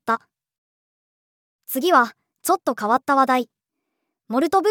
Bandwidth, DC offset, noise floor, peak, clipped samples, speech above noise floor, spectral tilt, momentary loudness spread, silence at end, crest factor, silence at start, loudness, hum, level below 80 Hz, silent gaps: over 20 kHz; under 0.1%; -79 dBFS; -4 dBFS; under 0.1%; 60 dB; -3 dB/octave; 10 LU; 0 s; 20 dB; 0.05 s; -21 LUFS; none; -74 dBFS; 0.58-1.59 s